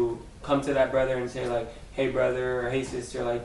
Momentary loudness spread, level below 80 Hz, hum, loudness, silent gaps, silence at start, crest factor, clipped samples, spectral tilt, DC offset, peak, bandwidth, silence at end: 8 LU; -46 dBFS; none; -28 LUFS; none; 0 s; 18 dB; under 0.1%; -6 dB/octave; under 0.1%; -10 dBFS; 11.5 kHz; 0 s